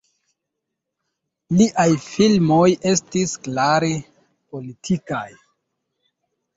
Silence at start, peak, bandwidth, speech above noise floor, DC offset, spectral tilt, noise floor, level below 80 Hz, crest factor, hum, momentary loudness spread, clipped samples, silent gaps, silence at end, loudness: 1.5 s; -4 dBFS; 8 kHz; 62 dB; under 0.1%; -5.5 dB/octave; -80 dBFS; -56 dBFS; 18 dB; none; 18 LU; under 0.1%; none; 1.25 s; -19 LUFS